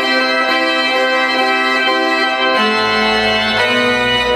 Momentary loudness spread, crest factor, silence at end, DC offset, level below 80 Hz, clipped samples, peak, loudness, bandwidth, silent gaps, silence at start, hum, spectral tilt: 1 LU; 12 dB; 0 s; under 0.1%; -44 dBFS; under 0.1%; -2 dBFS; -13 LUFS; 15 kHz; none; 0 s; none; -3 dB/octave